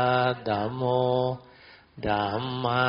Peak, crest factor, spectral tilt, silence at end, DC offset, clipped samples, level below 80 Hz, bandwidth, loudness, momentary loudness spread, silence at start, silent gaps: -10 dBFS; 16 dB; -4.5 dB/octave; 0 s; under 0.1%; under 0.1%; -56 dBFS; 5.6 kHz; -27 LUFS; 7 LU; 0 s; none